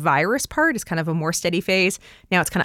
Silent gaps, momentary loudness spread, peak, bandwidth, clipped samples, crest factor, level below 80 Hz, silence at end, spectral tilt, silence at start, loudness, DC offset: none; 5 LU; -6 dBFS; 17 kHz; under 0.1%; 16 dB; -50 dBFS; 0 s; -4 dB/octave; 0 s; -21 LUFS; under 0.1%